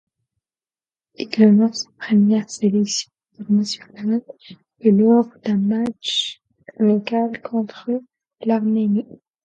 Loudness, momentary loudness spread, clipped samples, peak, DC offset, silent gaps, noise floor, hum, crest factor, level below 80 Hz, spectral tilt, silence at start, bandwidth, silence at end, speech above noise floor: -19 LUFS; 12 LU; under 0.1%; 0 dBFS; under 0.1%; none; under -90 dBFS; none; 20 dB; -68 dBFS; -5.5 dB/octave; 1.2 s; 8.8 kHz; 0.4 s; over 72 dB